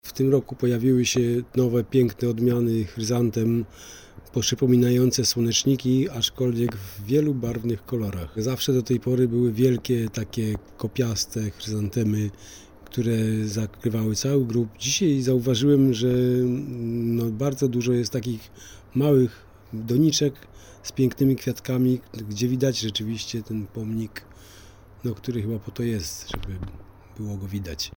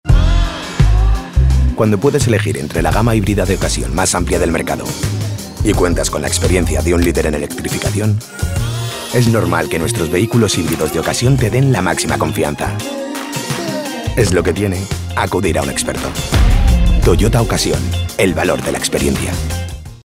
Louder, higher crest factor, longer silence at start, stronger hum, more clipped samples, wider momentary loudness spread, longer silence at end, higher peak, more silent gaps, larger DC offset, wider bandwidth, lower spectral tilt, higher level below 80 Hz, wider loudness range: second, -24 LUFS vs -15 LUFS; about the same, 16 dB vs 14 dB; about the same, 0.05 s vs 0.05 s; neither; neither; first, 13 LU vs 7 LU; about the same, 0.05 s vs 0.1 s; second, -8 dBFS vs 0 dBFS; neither; neither; first, over 20 kHz vs 16 kHz; about the same, -5.5 dB/octave vs -5 dB/octave; second, -50 dBFS vs -20 dBFS; first, 7 LU vs 2 LU